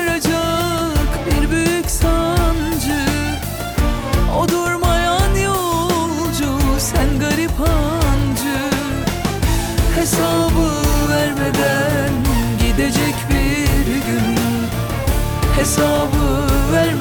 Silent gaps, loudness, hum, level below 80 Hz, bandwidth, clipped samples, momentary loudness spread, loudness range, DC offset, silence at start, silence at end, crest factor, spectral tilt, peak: none; -17 LUFS; none; -22 dBFS; over 20 kHz; under 0.1%; 4 LU; 1 LU; under 0.1%; 0 s; 0 s; 10 dB; -5 dB/octave; -6 dBFS